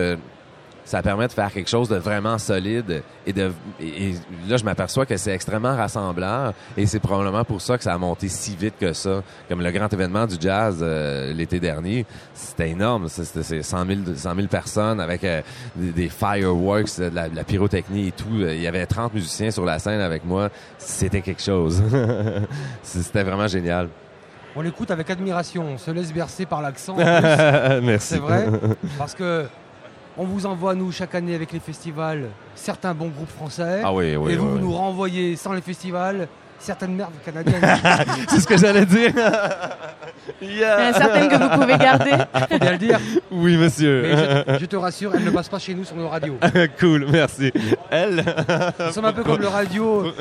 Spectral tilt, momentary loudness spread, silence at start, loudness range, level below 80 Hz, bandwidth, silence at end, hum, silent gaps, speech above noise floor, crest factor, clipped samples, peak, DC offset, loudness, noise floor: -5.5 dB/octave; 13 LU; 0 s; 8 LU; -46 dBFS; 14.5 kHz; 0 s; none; none; 25 dB; 20 dB; under 0.1%; 0 dBFS; under 0.1%; -21 LUFS; -45 dBFS